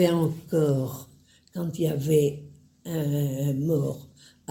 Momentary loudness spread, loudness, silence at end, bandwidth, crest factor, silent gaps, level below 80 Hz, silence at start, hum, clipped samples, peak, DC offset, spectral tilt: 18 LU; -26 LUFS; 0.45 s; 17 kHz; 18 dB; none; -60 dBFS; 0 s; none; under 0.1%; -8 dBFS; under 0.1%; -7.5 dB/octave